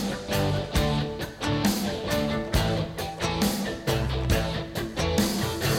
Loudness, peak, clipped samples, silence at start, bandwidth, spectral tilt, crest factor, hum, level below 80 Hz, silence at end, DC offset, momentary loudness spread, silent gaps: -27 LUFS; -8 dBFS; under 0.1%; 0 s; 16.5 kHz; -5 dB/octave; 18 dB; none; -36 dBFS; 0 s; under 0.1%; 5 LU; none